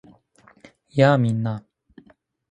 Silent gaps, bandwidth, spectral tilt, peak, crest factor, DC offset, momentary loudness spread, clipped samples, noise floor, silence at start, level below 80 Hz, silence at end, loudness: none; 9.2 kHz; -8 dB/octave; -2 dBFS; 22 dB; under 0.1%; 13 LU; under 0.1%; -57 dBFS; 0.95 s; -62 dBFS; 0.95 s; -20 LUFS